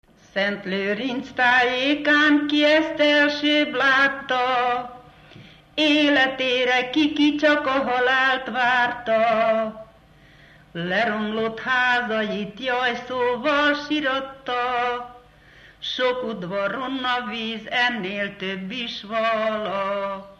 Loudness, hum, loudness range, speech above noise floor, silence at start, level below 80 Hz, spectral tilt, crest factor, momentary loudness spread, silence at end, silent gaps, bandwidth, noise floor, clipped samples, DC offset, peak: -21 LUFS; none; 7 LU; 30 dB; 0.35 s; -58 dBFS; -4.5 dB/octave; 16 dB; 11 LU; 0.05 s; none; 8.4 kHz; -51 dBFS; under 0.1%; under 0.1%; -6 dBFS